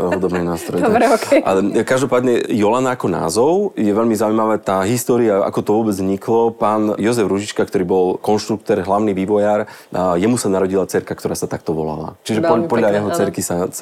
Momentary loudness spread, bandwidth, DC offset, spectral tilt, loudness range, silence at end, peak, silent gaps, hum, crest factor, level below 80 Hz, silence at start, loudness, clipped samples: 6 LU; 16 kHz; under 0.1%; -5.5 dB/octave; 3 LU; 0 s; 0 dBFS; none; none; 16 dB; -52 dBFS; 0 s; -17 LUFS; under 0.1%